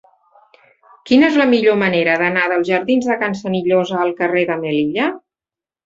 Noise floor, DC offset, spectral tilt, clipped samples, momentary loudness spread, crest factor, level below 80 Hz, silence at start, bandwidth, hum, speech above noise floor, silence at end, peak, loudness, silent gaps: -90 dBFS; under 0.1%; -6 dB/octave; under 0.1%; 7 LU; 16 dB; -60 dBFS; 1.05 s; 7.8 kHz; none; 74 dB; 0.7 s; -2 dBFS; -16 LUFS; none